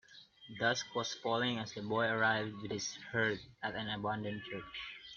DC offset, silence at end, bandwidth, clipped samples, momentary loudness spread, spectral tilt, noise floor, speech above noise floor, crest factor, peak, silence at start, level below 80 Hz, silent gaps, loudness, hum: under 0.1%; 0 s; 7.4 kHz; under 0.1%; 11 LU; -2.5 dB/octave; -57 dBFS; 20 dB; 20 dB; -18 dBFS; 0.1 s; -70 dBFS; none; -37 LUFS; none